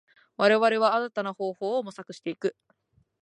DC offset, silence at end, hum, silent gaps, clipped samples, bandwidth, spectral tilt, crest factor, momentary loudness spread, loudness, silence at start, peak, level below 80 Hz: under 0.1%; 0.7 s; none; none; under 0.1%; 10.5 kHz; -5 dB/octave; 20 dB; 16 LU; -26 LUFS; 0.4 s; -6 dBFS; -80 dBFS